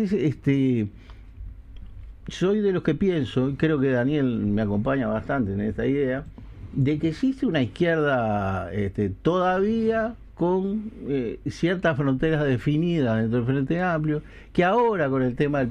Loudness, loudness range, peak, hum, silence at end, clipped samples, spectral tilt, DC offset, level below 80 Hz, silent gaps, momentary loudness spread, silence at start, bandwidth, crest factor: -24 LUFS; 2 LU; -8 dBFS; none; 0 s; under 0.1%; -8 dB/octave; under 0.1%; -44 dBFS; none; 9 LU; 0 s; 9.6 kHz; 16 dB